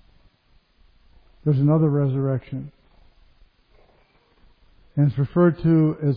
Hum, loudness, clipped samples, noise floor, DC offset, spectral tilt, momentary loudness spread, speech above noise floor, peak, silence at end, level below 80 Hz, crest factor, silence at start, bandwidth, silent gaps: none; -21 LUFS; under 0.1%; -60 dBFS; under 0.1%; -13 dB/octave; 14 LU; 40 dB; -6 dBFS; 0 s; -52 dBFS; 18 dB; 1.45 s; 4.8 kHz; none